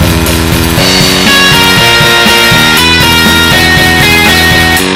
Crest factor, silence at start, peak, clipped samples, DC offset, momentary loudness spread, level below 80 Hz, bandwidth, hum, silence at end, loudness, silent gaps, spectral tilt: 6 dB; 0 s; 0 dBFS; 5%; under 0.1%; 4 LU; -20 dBFS; over 20 kHz; none; 0 s; -4 LUFS; none; -3 dB/octave